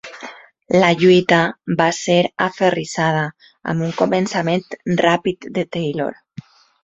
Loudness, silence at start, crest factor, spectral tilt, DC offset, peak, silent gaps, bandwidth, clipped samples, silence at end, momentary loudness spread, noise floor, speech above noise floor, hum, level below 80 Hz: -18 LUFS; 0.05 s; 16 dB; -5.5 dB/octave; under 0.1%; -2 dBFS; none; 8 kHz; under 0.1%; 0.7 s; 12 LU; -39 dBFS; 22 dB; none; -58 dBFS